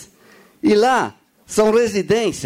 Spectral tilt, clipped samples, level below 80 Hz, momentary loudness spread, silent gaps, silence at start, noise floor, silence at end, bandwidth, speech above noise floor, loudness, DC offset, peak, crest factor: -4.5 dB/octave; under 0.1%; -52 dBFS; 8 LU; none; 0 s; -49 dBFS; 0 s; 16 kHz; 33 dB; -17 LUFS; under 0.1%; -6 dBFS; 12 dB